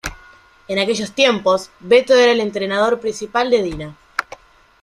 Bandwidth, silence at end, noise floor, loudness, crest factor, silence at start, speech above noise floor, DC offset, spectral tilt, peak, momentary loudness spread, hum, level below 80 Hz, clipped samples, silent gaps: 13 kHz; 0.6 s; -47 dBFS; -17 LUFS; 16 dB; 0.05 s; 30 dB; under 0.1%; -3.5 dB/octave; -2 dBFS; 14 LU; none; -46 dBFS; under 0.1%; none